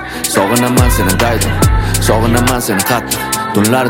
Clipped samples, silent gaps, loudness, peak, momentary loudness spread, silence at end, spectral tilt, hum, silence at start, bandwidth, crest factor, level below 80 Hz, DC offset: under 0.1%; none; -12 LUFS; 0 dBFS; 4 LU; 0 s; -4.5 dB/octave; none; 0 s; 17.5 kHz; 12 dB; -20 dBFS; under 0.1%